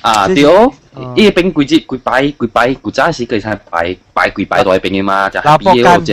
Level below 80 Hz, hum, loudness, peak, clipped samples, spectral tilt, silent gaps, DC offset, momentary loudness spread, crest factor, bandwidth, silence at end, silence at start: -38 dBFS; none; -11 LUFS; 0 dBFS; 0.9%; -5.5 dB/octave; none; under 0.1%; 10 LU; 10 dB; 15.5 kHz; 0 s; 0.05 s